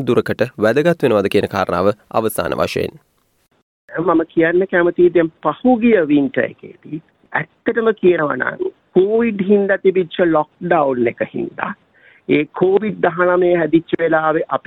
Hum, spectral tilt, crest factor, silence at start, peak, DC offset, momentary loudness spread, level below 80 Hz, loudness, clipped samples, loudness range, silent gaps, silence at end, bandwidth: none; -6.5 dB/octave; 14 dB; 0 s; -2 dBFS; under 0.1%; 10 LU; -54 dBFS; -16 LUFS; under 0.1%; 3 LU; 3.62-3.88 s; 0.1 s; 16 kHz